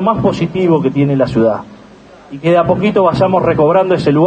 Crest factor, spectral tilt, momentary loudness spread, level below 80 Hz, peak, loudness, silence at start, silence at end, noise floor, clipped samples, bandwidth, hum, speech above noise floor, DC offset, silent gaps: 12 dB; -8.5 dB/octave; 4 LU; -42 dBFS; 0 dBFS; -12 LUFS; 0 s; 0 s; -39 dBFS; under 0.1%; 8.8 kHz; none; 27 dB; under 0.1%; none